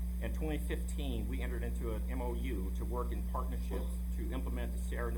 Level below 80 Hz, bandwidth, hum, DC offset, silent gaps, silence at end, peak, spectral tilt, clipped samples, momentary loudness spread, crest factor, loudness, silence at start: -36 dBFS; 18 kHz; none; under 0.1%; none; 0 s; -24 dBFS; -6.5 dB/octave; under 0.1%; 1 LU; 12 dB; -38 LUFS; 0 s